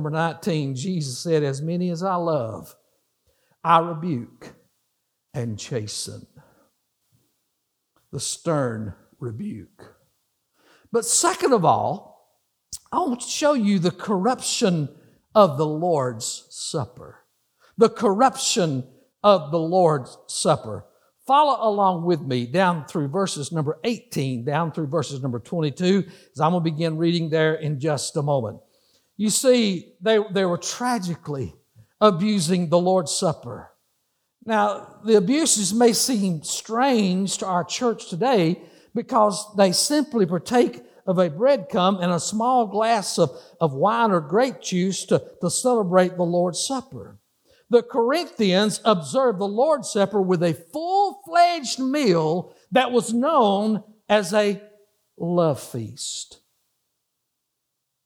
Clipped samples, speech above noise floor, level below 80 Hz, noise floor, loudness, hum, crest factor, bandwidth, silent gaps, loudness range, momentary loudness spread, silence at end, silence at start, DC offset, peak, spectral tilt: under 0.1%; 57 dB; -66 dBFS; -79 dBFS; -22 LUFS; none; 20 dB; over 20 kHz; none; 6 LU; 12 LU; 1.7 s; 0 s; under 0.1%; -2 dBFS; -4.5 dB/octave